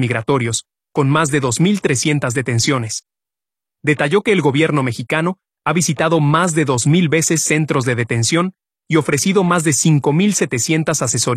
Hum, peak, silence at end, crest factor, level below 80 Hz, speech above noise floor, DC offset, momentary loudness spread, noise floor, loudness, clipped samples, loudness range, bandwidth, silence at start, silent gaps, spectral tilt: none; 0 dBFS; 0 s; 16 dB; -54 dBFS; 73 dB; under 0.1%; 6 LU; -89 dBFS; -16 LUFS; under 0.1%; 2 LU; 14.5 kHz; 0 s; none; -4.5 dB/octave